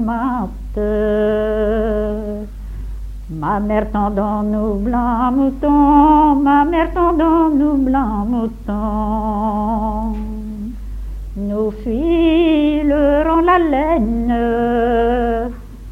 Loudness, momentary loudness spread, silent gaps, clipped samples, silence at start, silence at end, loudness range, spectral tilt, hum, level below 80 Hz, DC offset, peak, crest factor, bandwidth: -16 LUFS; 14 LU; none; under 0.1%; 0 s; 0 s; 7 LU; -8.5 dB/octave; none; -28 dBFS; under 0.1%; -2 dBFS; 14 dB; 6 kHz